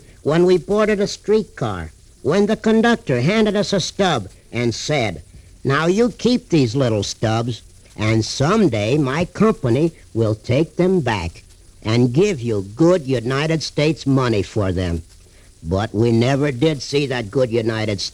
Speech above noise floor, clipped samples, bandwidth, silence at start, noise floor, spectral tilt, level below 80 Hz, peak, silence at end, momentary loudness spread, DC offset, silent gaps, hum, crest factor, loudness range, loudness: 28 dB; under 0.1%; 12.5 kHz; 0.25 s; -46 dBFS; -6 dB/octave; -42 dBFS; -4 dBFS; 0.05 s; 8 LU; under 0.1%; none; none; 14 dB; 2 LU; -19 LUFS